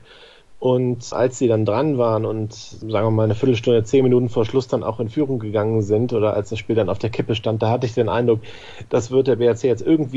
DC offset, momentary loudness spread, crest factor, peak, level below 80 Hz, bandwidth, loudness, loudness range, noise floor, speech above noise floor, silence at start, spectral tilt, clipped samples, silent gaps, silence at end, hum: under 0.1%; 7 LU; 14 dB; -4 dBFS; -54 dBFS; 8 kHz; -20 LUFS; 2 LU; -46 dBFS; 27 dB; 0.2 s; -7 dB/octave; under 0.1%; none; 0 s; none